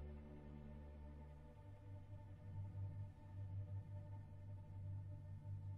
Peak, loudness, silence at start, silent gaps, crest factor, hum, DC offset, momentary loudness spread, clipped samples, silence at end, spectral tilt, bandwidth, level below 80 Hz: -40 dBFS; -55 LUFS; 0 s; none; 12 dB; none; under 0.1%; 7 LU; under 0.1%; 0 s; -9.5 dB/octave; 3.8 kHz; -62 dBFS